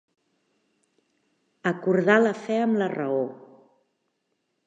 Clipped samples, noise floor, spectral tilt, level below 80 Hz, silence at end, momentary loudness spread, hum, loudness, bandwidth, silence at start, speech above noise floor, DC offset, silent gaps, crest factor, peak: under 0.1%; -76 dBFS; -7 dB/octave; -82 dBFS; 1.3 s; 10 LU; none; -24 LUFS; 8 kHz; 1.65 s; 53 dB; under 0.1%; none; 22 dB; -6 dBFS